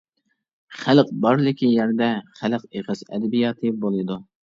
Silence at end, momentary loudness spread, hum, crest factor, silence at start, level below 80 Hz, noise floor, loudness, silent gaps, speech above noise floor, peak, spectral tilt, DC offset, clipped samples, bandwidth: 0.4 s; 12 LU; none; 20 dB; 0.7 s; -66 dBFS; -73 dBFS; -22 LUFS; none; 52 dB; -2 dBFS; -7.5 dB/octave; under 0.1%; under 0.1%; 7.4 kHz